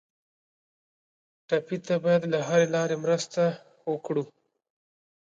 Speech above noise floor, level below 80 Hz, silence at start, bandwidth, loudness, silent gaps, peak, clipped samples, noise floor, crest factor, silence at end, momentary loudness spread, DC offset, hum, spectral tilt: over 64 dB; -76 dBFS; 1.5 s; 7.8 kHz; -27 LUFS; none; -10 dBFS; under 0.1%; under -90 dBFS; 20 dB; 1.15 s; 10 LU; under 0.1%; none; -5.5 dB/octave